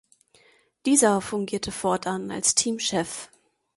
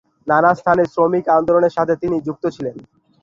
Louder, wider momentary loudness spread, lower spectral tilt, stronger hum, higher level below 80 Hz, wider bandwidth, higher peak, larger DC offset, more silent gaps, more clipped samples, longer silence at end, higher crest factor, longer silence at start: second, -24 LUFS vs -17 LUFS; about the same, 11 LU vs 10 LU; second, -3 dB/octave vs -8 dB/octave; neither; second, -60 dBFS vs -54 dBFS; first, 12 kHz vs 7.4 kHz; about the same, -4 dBFS vs -2 dBFS; neither; neither; neither; about the same, 0.5 s vs 0.4 s; first, 22 dB vs 16 dB; first, 0.85 s vs 0.25 s